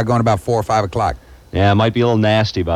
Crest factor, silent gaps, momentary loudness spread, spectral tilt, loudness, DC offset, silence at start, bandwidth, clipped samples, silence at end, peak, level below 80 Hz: 14 dB; none; 7 LU; -6.5 dB/octave; -16 LUFS; under 0.1%; 0 s; 13 kHz; under 0.1%; 0 s; -2 dBFS; -36 dBFS